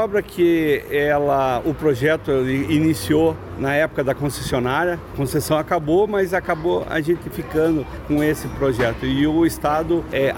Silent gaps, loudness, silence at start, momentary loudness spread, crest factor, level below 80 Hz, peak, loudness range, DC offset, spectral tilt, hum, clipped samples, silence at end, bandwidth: none; -20 LUFS; 0 s; 5 LU; 14 dB; -40 dBFS; -6 dBFS; 2 LU; under 0.1%; -6 dB/octave; none; under 0.1%; 0 s; 17 kHz